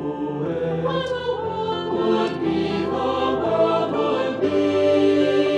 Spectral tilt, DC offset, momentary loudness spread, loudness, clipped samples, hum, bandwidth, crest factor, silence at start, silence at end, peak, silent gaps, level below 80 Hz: -7 dB/octave; under 0.1%; 7 LU; -21 LUFS; under 0.1%; none; 9.4 kHz; 14 dB; 0 s; 0 s; -8 dBFS; none; -52 dBFS